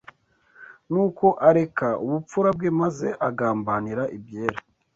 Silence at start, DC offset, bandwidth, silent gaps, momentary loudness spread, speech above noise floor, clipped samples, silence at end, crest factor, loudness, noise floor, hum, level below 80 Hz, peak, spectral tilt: 0.6 s; under 0.1%; 7.8 kHz; none; 11 LU; 36 dB; under 0.1%; 0.35 s; 20 dB; -23 LUFS; -58 dBFS; none; -60 dBFS; -2 dBFS; -8 dB/octave